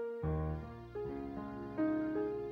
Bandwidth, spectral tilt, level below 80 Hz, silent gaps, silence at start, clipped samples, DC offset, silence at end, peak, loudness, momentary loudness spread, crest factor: 5.6 kHz; -10 dB/octave; -50 dBFS; none; 0 s; under 0.1%; under 0.1%; 0 s; -26 dBFS; -39 LUFS; 9 LU; 12 dB